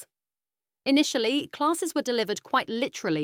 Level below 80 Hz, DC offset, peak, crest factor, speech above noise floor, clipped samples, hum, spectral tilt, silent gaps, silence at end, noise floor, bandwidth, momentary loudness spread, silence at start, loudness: -74 dBFS; under 0.1%; -10 dBFS; 18 dB; over 64 dB; under 0.1%; none; -3.5 dB/octave; none; 0 s; under -90 dBFS; 16.5 kHz; 6 LU; 0 s; -26 LUFS